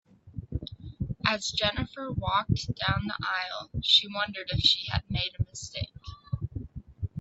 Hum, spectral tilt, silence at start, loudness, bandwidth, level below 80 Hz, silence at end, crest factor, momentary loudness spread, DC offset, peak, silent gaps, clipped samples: none; -4 dB/octave; 0.25 s; -28 LUFS; 8 kHz; -46 dBFS; 0 s; 24 dB; 17 LU; under 0.1%; -8 dBFS; none; under 0.1%